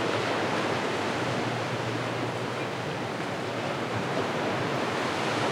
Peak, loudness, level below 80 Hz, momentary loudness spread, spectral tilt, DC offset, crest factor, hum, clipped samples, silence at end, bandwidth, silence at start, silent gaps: -14 dBFS; -29 LUFS; -66 dBFS; 4 LU; -5 dB/octave; under 0.1%; 14 dB; none; under 0.1%; 0 s; 16.5 kHz; 0 s; none